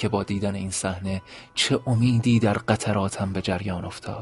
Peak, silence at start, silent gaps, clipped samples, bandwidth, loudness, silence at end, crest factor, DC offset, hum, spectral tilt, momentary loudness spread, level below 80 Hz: -4 dBFS; 0 s; none; under 0.1%; 11.5 kHz; -25 LUFS; 0 s; 20 dB; under 0.1%; none; -5.5 dB/octave; 11 LU; -50 dBFS